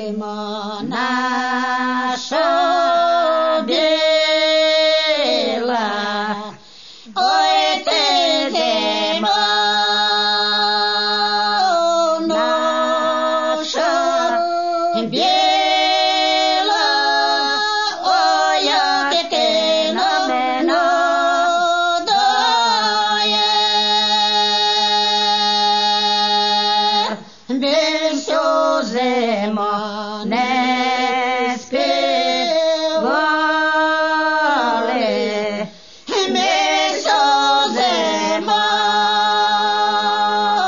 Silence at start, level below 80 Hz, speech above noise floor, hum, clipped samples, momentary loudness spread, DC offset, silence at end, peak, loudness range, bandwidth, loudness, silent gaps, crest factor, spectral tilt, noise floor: 0 s; -70 dBFS; 20 dB; none; under 0.1%; 6 LU; 0.4%; 0 s; -4 dBFS; 3 LU; 7.4 kHz; -16 LUFS; none; 14 dB; -2 dB/octave; -41 dBFS